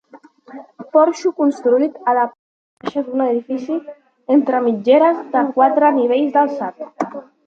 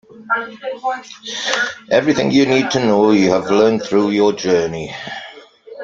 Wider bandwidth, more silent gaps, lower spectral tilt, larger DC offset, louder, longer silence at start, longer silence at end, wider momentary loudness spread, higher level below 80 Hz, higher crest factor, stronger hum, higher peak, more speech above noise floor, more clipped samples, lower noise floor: about the same, 7.6 kHz vs 7.8 kHz; first, 2.39-2.77 s vs none; about the same, -6 dB/octave vs -5 dB/octave; neither; about the same, -17 LUFS vs -16 LUFS; about the same, 0.15 s vs 0.15 s; first, 0.25 s vs 0 s; about the same, 13 LU vs 14 LU; second, -72 dBFS vs -54 dBFS; about the same, 16 dB vs 16 dB; neither; about the same, -2 dBFS vs 0 dBFS; first, 29 dB vs 23 dB; neither; first, -44 dBFS vs -38 dBFS